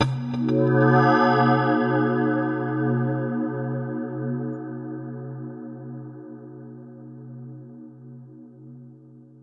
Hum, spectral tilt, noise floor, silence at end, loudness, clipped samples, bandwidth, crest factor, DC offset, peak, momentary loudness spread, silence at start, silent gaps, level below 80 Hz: none; -8.5 dB/octave; -48 dBFS; 0.2 s; -23 LUFS; under 0.1%; 6.4 kHz; 18 dB; under 0.1%; -6 dBFS; 25 LU; 0 s; none; -62 dBFS